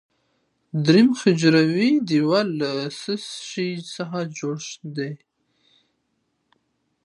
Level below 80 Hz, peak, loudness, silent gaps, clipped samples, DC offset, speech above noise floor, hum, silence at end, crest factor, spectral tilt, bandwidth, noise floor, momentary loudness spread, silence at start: -72 dBFS; -4 dBFS; -22 LUFS; none; under 0.1%; under 0.1%; 51 dB; none; 1.9 s; 20 dB; -6 dB/octave; 11 kHz; -72 dBFS; 14 LU; 0.75 s